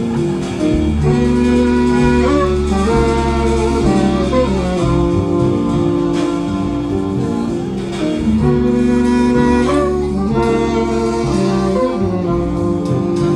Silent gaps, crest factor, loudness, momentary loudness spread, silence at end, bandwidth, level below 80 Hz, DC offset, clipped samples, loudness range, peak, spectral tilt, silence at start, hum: none; 14 dB; -15 LUFS; 5 LU; 0 s; 11 kHz; -26 dBFS; under 0.1%; under 0.1%; 3 LU; 0 dBFS; -7 dB/octave; 0 s; none